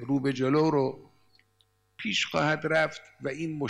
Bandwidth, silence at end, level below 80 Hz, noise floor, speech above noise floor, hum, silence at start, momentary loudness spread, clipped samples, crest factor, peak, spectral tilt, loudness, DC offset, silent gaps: 14.5 kHz; 0 s; -68 dBFS; -69 dBFS; 42 dB; none; 0 s; 12 LU; under 0.1%; 16 dB; -14 dBFS; -5.5 dB/octave; -28 LUFS; under 0.1%; none